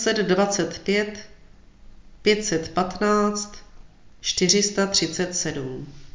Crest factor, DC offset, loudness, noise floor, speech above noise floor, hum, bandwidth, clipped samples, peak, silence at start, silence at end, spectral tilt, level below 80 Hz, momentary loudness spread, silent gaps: 20 dB; under 0.1%; -22 LUFS; -48 dBFS; 25 dB; none; 7.8 kHz; under 0.1%; -4 dBFS; 0 s; 0.05 s; -3 dB/octave; -50 dBFS; 13 LU; none